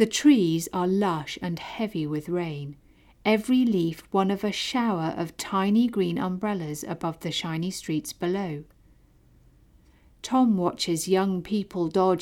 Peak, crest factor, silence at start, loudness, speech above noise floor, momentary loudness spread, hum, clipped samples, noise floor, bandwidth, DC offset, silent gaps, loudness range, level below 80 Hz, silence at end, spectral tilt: -8 dBFS; 18 dB; 0 s; -26 LUFS; 32 dB; 10 LU; none; under 0.1%; -58 dBFS; 17.5 kHz; under 0.1%; none; 6 LU; -58 dBFS; 0 s; -5.5 dB/octave